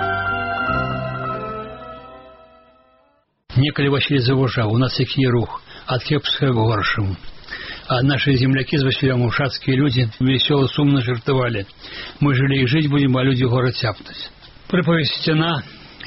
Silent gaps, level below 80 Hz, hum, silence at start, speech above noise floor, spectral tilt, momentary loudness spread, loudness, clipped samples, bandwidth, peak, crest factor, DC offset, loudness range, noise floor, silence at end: none; -44 dBFS; none; 0 s; 43 dB; -5 dB/octave; 15 LU; -19 LUFS; under 0.1%; 5.8 kHz; -4 dBFS; 16 dB; under 0.1%; 5 LU; -61 dBFS; 0 s